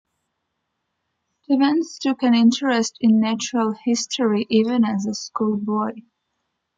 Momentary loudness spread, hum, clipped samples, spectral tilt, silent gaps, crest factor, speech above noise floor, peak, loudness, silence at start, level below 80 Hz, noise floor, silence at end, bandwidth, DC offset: 7 LU; none; under 0.1%; -4.5 dB/octave; none; 16 dB; 57 dB; -6 dBFS; -20 LUFS; 1.5 s; -66 dBFS; -76 dBFS; 0.75 s; 7.8 kHz; under 0.1%